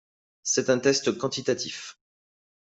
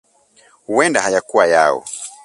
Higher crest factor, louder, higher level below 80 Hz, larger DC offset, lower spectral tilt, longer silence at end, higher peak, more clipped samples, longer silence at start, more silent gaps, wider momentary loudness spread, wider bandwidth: about the same, 20 dB vs 18 dB; second, -26 LUFS vs -15 LUFS; second, -68 dBFS vs -60 dBFS; neither; about the same, -3 dB/octave vs -3 dB/octave; first, 0.7 s vs 0.15 s; second, -8 dBFS vs 0 dBFS; neither; second, 0.45 s vs 0.7 s; neither; first, 14 LU vs 10 LU; second, 8.2 kHz vs 11.5 kHz